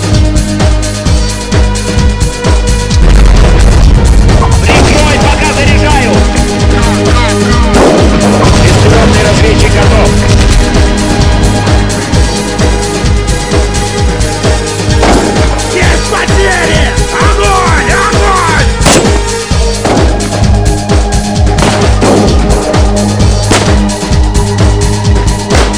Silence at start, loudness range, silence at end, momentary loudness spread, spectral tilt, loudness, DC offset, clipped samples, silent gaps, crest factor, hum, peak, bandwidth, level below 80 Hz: 0 s; 3 LU; 0 s; 5 LU; -5 dB/octave; -8 LUFS; under 0.1%; 7%; none; 6 dB; none; 0 dBFS; 11 kHz; -10 dBFS